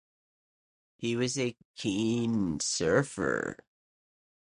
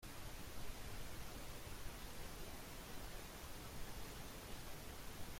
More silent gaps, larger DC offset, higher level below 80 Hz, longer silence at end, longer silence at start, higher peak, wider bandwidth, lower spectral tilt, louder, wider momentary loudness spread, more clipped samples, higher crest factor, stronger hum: first, 1.65-1.74 s vs none; neither; about the same, -60 dBFS vs -56 dBFS; first, 0.85 s vs 0 s; first, 1 s vs 0 s; first, -10 dBFS vs -34 dBFS; second, 11 kHz vs 16.5 kHz; about the same, -4.5 dB/octave vs -3.5 dB/octave; first, -30 LUFS vs -53 LUFS; first, 9 LU vs 1 LU; neither; first, 22 dB vs 14 dB; neither